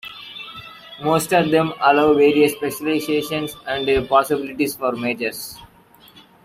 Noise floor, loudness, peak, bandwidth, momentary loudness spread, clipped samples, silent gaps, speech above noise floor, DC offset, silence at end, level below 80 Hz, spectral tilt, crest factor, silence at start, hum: -50 dBFS; -19 LUFS; -2 dBFS; 16 kHz; 19 LU; under 0.1%; none; 31 dB; under 0.1%; 0.25 s; -50 dBFS; -4.5 dB/octave; 18 dB; 0.05 s; none